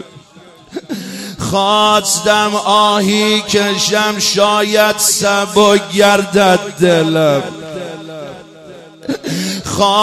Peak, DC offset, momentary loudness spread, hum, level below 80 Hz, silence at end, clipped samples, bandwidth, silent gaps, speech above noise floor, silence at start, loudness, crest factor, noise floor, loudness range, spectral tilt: 0 dBFS; under 0.1%; 16 LU; none; -48 dBFS; 0 s; under 0.1%; 16 kHz; none; 29 dB; 0 s; -12 LUFS; 14 dB; -41 dBFS; 4 LU; -3 dB/octave